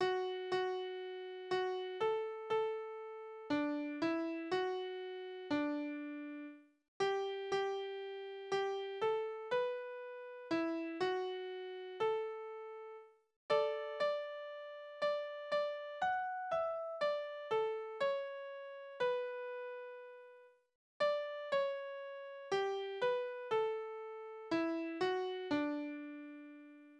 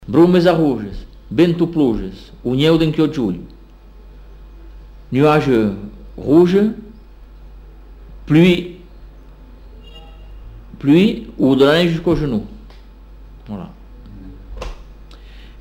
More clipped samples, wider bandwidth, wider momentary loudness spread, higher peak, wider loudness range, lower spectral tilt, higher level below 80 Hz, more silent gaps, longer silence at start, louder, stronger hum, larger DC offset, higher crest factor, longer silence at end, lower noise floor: neither; second, 9.8 kHz vs 15.5 kHz; second, 12 LU vs 21 LU; second, -20 dBFS vs -2 dBFS; about the same, 2 LU vs 4 LU; second, -4.5 dB/octave vs -7.5 dB/octave; second, -82 dBFS vs -36 dBFS; first, 6.88-7.00 s, 13.36-13.49 s, 20.75-21.00 s vs none; about the same, 0 s vs 0 s; second, -40 LUFS vs -15 LUFS; neither; neither; about the same, 20 dB vs 16 dB; about the same, 0 s vs 0.1 s; first, -62 dBFS vs -41 dBFS